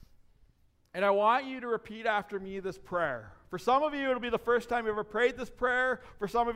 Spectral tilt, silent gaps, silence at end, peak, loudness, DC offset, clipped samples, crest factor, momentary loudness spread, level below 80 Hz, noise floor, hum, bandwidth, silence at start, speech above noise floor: -5 dB/octave; none; 0 s; -14 dBFS; -31 LUFS; under 0.1%; under 0.1%; 16 dB; 11 LU; -58 dBFS; -66 dBFS; none; 15.5 kHz; 0.95 s; 36 dB